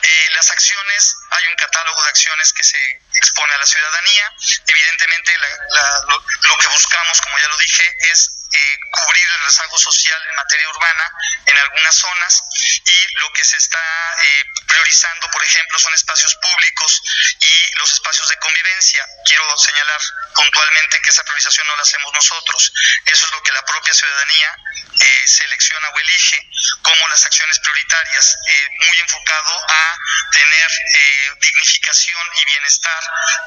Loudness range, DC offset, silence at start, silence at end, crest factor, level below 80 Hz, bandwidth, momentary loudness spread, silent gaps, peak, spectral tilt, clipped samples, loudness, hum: 1 LU; under 0.1%; 0 s; 0 s; 14 dB; -56 dBFS; 12 kHz; 6 LU; none; 0 dBFS; 6 dB/octave; under 0.1%; -11 LUFS; none